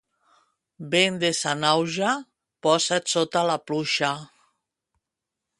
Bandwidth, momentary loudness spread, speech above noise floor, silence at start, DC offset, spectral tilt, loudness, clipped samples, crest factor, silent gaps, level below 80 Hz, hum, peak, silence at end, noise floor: 11.5 kHz; 7 LU; 62 dB; 0.8 s; under 0.1%; -3 dB/octave; -23 LUFS; under 0.1%; 22 dB; none; -70 dBFS; none; -4 dBFS; 1.35 s; -86 dBFS